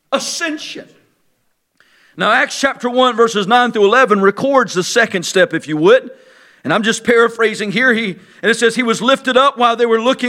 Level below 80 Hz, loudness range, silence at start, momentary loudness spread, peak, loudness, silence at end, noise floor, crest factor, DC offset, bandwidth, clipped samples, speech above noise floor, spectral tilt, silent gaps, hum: -62 dBFS; 3 LU; 0.1 s; 8 LU; 0 dBFS; -13 LUFS; 0 s; -63 dBFS; 14 dB; under 0.1%; 15 kHz; under 0.1%; 50 dB; -3.5 dB/octave; none; none